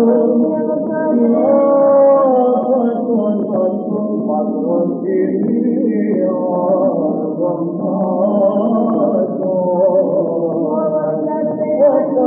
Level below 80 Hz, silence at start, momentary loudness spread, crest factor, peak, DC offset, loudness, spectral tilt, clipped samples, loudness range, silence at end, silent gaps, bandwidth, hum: -76 dBFS; 0 s; 7 LU; 12 dB; -2 dBFS; under 0.1%; -15 LUFS; -10.5 dB/octave; under 0.1%; 3 LU; 0 s; none; 3.3 kHz; none